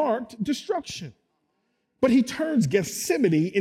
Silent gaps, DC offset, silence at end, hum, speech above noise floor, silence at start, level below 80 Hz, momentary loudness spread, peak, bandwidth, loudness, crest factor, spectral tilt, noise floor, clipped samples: none; under 0.1%; 0 s; none; 50 dB; 0 s; -62 dBFS; 11 LU; -8 dBFS; 16.5 kHz; -24 LUFS; 16 dB; -5.5 dB/octave; -74 dBFS; under 0.1%